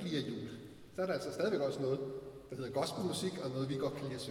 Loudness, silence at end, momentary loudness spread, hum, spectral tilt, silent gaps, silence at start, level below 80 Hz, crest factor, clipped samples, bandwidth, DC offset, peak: -38 LUFS; 0 s; 12 LU; none; -5.5 dB/octave; none; 0 s; -68 dBFS; 16 dB; under 0.1%; 17 kHz; under 0.1%; -22 dBFS